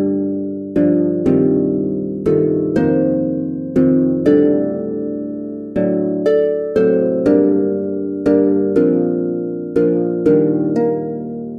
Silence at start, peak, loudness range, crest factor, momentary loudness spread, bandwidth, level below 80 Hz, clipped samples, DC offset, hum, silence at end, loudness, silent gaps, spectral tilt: 0 s; -2 dBFS; 1 LU; 14 dB; 8 LU; 5 kHz; -48 dBFS; under 0.1%; under 0.1%; none; 0 s; -16 LUFS; none; -10 dB/octave